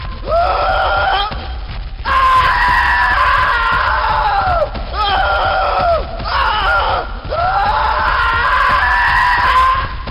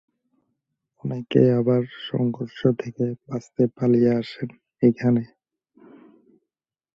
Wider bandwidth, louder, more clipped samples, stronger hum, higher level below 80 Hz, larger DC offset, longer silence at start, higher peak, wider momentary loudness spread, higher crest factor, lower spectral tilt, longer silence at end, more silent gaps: first, 15.5 kHz vs 7.2 kHz; first, -13 LUFS vs -23 LUFS; neither; neither; first, -24 dBFS vs -62 dBFS; neither; second, 0 s vs 1.05 s; about the same, -4 dBFS vs -4 dBFS; second, 7 LU vs 14 LU; second, 10 dB vs 20 dB; second, -4.5 dB/octave vs -9 dB/octave; second, 0 s vs 1.7 s; neither